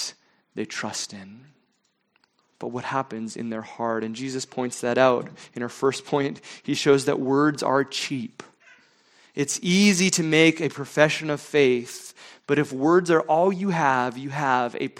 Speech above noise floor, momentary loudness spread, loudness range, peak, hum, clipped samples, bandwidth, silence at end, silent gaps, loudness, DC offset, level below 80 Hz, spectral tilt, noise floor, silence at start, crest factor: 47 dB; 15 LU; 11 LU; 0 dBFS; none; under 0.1%; 16.5 kHz; 0.1 s; none; -23 LUFS; under 0.1%; -68 dBFS; -4.5 dB/octave; -71 dBFS; 0 s; 24 dB